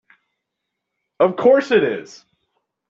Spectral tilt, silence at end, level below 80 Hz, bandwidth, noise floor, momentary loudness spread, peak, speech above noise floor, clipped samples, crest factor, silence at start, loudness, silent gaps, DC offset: -6 dB/octave; 0.85 s; -66 dBFS; 7.6 kHz; -79 dBFS; 9 LU; -2 dBFS; 63 dB; under 0.1%; 18 dB; 1.2 s; -16 LUFS; none; under 0.1%